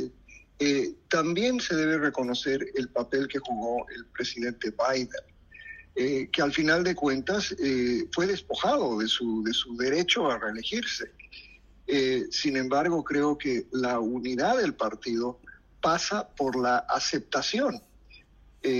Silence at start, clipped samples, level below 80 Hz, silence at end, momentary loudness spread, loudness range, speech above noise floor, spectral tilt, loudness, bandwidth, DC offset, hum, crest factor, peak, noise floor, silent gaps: 0 s; under 0.1%; -58 dBFS; 0 s; 9 LU; 3 LU; 28 dB; -4 dB/octave; -28 LUFS; 10.5 kHz; under 0.1%; none; 18 dB; -12 dBFS; -55 dBFS; none